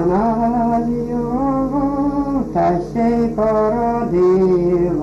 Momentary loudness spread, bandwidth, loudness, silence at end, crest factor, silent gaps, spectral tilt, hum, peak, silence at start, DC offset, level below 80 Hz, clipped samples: 5 LU; 7.8 kHz; -17 LUFS; 0 s; 10 dB; none; -9.5 dB/octave; 50 Hz at -35 dBFS; -6 dBFS; 0 s; under 0.1%; -36 dBFS; under 0.1%